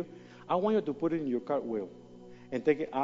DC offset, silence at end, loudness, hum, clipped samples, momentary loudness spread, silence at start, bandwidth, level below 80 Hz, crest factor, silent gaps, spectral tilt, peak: under 0.1%; 0 s; -32 LUFS; none; under 0.1%; 22 LU; 0 s; 7.4 kHz; -68 dBFS; 18 dB; none; -8 dB/octave; -14 dBFS